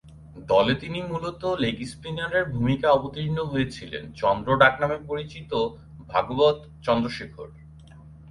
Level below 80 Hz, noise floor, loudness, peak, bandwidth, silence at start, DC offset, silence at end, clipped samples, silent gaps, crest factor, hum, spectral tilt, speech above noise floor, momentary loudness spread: -48 dBFS; -46 dBFS; -25 LUFS; -4 dBFS; 11.5 kHz; 0.05 s; under 0.1%; 0 s; under 0.1%; none; 22 dB; none; -6.5 dB/octave; 22 dB; 14 LU